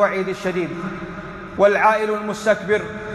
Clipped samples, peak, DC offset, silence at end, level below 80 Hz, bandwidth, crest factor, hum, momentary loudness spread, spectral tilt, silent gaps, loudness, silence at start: under 0.1%; -4 dBFS; under 0.1%; 0 s; -50 dBFS; 12.5 kHz; 16 dB; none; 16 LU; -5.5 dB/octave; none; -20 LUFS; 0 s